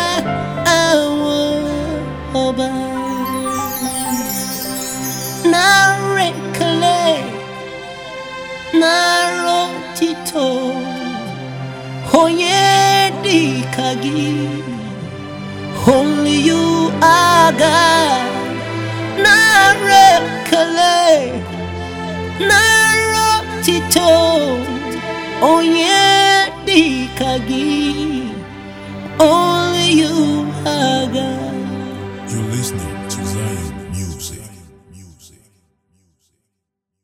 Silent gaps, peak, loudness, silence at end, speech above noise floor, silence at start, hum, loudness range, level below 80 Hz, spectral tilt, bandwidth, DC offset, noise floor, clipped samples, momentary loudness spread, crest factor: none; 0 dBFS; -14 LUFS; 1.95 s; 64 dB; 0 s; none; 9 LU; -42 dBFS; -3.5 dB/octave; over 20 kHz; under 0.1%; -77 dBFS; under 0.1%; 17 LU; 16 dB